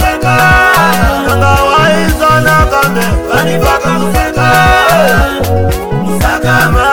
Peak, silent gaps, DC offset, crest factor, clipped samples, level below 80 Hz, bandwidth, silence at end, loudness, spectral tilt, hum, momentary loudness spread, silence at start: 0 dBFS; none; 4%; 8 dB; 0.3%; -18 dBFS; over 20 kHz; 0 s; -8 LUFS; -5 dB/octave; none; 6 LU; 0 s